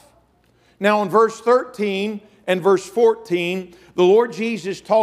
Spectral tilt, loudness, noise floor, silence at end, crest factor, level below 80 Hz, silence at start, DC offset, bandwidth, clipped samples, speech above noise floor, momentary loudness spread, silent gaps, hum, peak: -5.5 dB/octave; -19 LUFS; -58 dBFS; 0 s; 18 dB; -66 dBFS; 0.8 s; under 0.1%; 14 kHz; under 0.1%; 40 dB; 11 LU; none; none; -2 dBFS